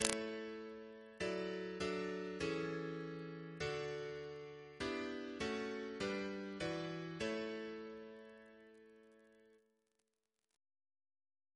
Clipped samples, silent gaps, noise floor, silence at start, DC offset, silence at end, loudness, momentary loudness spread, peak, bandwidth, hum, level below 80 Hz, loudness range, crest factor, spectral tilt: under 0.1%; none; -89 dBFS; 0 s; under 0.1%; 2 s; -44 LUFS; 14 LU; -8 dBFS; 11 kHz; none; -70 dBFS; 8 LU; 38 dB; -4 dB/octave